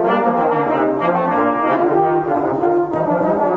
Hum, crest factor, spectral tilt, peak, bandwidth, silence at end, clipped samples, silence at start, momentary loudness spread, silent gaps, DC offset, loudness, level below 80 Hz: none; 14 dB; -9 dB/octave; -2 dBFS; 5.4 kHz; 0 s; under 0.1%; 0 s; 2 LU; none; under 0.1%; -16 LUFS; -54 dBFS